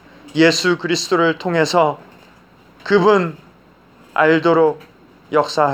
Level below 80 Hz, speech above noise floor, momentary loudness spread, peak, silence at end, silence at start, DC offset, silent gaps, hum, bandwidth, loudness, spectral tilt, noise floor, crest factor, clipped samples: -62 dBFS; 33 dB; 12 LU; 0 dBFS; 0 s; 0.25 s; under 0.1%; none; none; 15.5 kHz; -16 LUFS; -4.5 dB/octave; -49 dBFS; 16 dB; under 0.1%